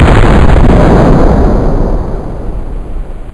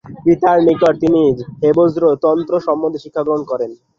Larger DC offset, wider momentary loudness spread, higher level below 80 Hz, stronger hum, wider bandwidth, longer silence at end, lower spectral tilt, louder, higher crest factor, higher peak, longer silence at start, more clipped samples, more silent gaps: first, 2% vs under 0.1%; first, 17 LU vs 8 LU; first, -10 dBFS vs -52 dBFS; neither; first, 10.5 kHz vs 7.2 kHz; second, 0 s vs 0.25 s; about the same, -8 dB/octave vs -8.5 dB/octave; first, -8 LUFS vs -15 LUFS; second, 6 dB vs 14 dB; about the same, 0 dBFS vs -2 dBFS; about the same, 0 s vs 0.05 s; first, 6% vs under 0.1%; neither